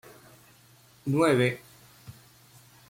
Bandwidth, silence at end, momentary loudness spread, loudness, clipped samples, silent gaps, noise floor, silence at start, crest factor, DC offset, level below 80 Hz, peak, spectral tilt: 16.5 kHz; 0.8 s; 27 LU; -26 LUFS; under 0.1%; none; -58 dBFS; 1.05 s; 20 dB; under 0.1%; -66 dBFS; -10 dBFS; -6 dB/octave